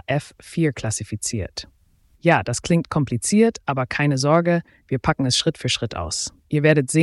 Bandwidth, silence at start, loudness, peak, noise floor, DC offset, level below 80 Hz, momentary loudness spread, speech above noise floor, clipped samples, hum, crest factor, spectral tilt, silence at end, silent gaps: 12 kHz; 0.1 s; -21 LUFS; -4 dBFS; -58 dBFS; under 0.1%; -46 dBFS; 9 LU; 37 dB; under 0.1%; none; 18 dB; -5 dB/octave; 0 s; none